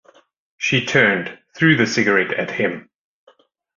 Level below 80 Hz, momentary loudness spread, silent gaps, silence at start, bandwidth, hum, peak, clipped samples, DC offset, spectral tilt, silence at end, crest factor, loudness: -58 dBFS; 9 LU; none; 0.6 s; 7.6 kHz; none; -2 dBFS; under 0.1%; under 0.1%; -5 dB/octave; 1 s; 18 dB; -17 LUFS